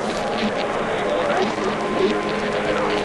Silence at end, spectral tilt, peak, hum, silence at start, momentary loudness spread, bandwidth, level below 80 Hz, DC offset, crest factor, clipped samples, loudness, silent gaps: 0 s; -4.5 dB/octave; -8 dBFS; none; 0 s; 2 LU; 11.5 kHz; -46 dBFS; under 0.1%; 14 dB; under 0.1%; -22 LUFS; none